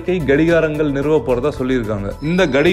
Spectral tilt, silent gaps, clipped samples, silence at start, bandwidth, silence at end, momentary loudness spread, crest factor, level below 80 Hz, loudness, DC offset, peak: -7 dB/octave; none; under 0.1%; 0 s; 15 kHz; 0 s; 6 LU; 12 dB; -34 dBFS; -17 LUFS; under 0.1%; -4 dBFS